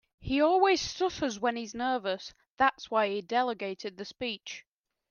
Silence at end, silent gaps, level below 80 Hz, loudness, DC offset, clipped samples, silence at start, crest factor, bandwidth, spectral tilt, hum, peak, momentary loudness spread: 0.5 s; 2.50-2.57 s; -60 dBFS; -30 LUFS; under 0.1%; under 0.1%; 0.2 s; 18 dB; 7.2 kHz; -3.5 dB/octave; none; -12 dBFS; 14 LU